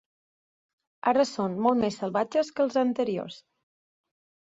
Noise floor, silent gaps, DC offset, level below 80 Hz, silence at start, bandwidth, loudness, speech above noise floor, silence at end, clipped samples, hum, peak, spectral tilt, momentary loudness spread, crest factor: under -90 dBFS; none; under 0.1%; -68 dBFS; 1.05 s; 7.8 kHz; -27 LUFS; over 64 dB; 1.15 s; under 0.1%; none; -10 dBFS; -5.5 dB/octave; 6 LU; 18 dB